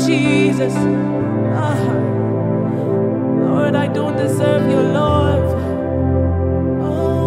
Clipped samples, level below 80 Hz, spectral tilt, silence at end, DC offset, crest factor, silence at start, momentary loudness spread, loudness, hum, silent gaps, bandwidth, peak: under 0.1%; -34 dBFS; -7.5 dB/octave; 0 s; under 0.1%; 14 dB; 0 s; 4 LU; -17 LUFS; none; none; 14 kHz; -2 dBFS